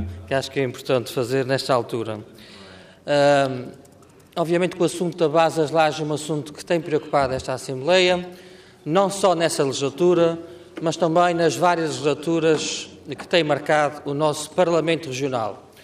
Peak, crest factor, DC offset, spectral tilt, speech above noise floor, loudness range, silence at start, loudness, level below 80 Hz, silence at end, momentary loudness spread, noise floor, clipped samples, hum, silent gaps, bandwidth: -6 dBFS; 16 dB; under 0.1%; -5 dB/octave; 28 dB; 3 LU; 0 s; -21 LUFS; -60 dBFS; 0.25 s; 12 LU; -49 dBFS; under 0.1%; none; none; 15.5 kHz